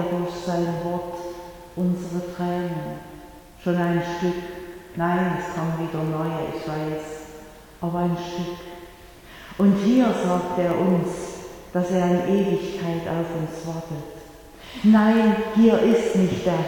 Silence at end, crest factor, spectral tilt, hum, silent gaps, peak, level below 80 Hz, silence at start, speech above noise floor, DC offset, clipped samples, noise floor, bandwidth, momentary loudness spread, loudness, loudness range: 0 s; 20 dB; -7 dB/octave; none; none; -4 dBFS; -50 dBFS; 0 s; 23 dB; under 0.1%; under 0.1%; -45 dBFS; 18.5 kHz; 20 LU; -23 LUFS; 7 LU